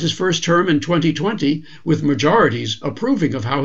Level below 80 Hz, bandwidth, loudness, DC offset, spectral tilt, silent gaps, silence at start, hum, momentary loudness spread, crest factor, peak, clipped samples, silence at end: -52 dBFS; 7.8 kHz; -18 LUFS; 1%; -5.5 dB/octave; none; 0 s; none; 7 LU; 16 dB; -2 dBFS; under 0.1%; 0 s